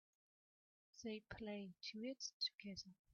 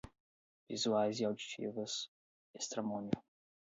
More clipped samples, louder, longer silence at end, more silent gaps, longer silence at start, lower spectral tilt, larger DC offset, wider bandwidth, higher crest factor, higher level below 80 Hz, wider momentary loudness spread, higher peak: neither; second, -50 LUFS vs -39 LUFS; second, 0.2 s vs 0.4 s; second, 2.33-2.40 s vs 0.20-0.67 s, 2.08-2.54 s; first, 0.95 s vs 0.05 s; second, -2.5 dB/octave vs -4 dB/octave; neither; second, 7 kHz vs 8 kHz; about the same, 20 dB vs 22 dB; about the same, -76 dBFS vs -72 dBFS; about the same, 10 LU vs 10 LU; second, -32 dBFS vs -20 dBFS